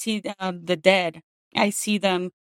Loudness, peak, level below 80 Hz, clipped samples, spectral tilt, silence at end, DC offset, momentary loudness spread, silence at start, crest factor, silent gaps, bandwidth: -23 LUFS; -2 dBFS; -72 dBFS; under 0.1%; -4 dB/octave; 0.25 s; under 0.1%; 11 LU; 0 s; 22 dB; 1.23-1.51 s; 16.5 kHz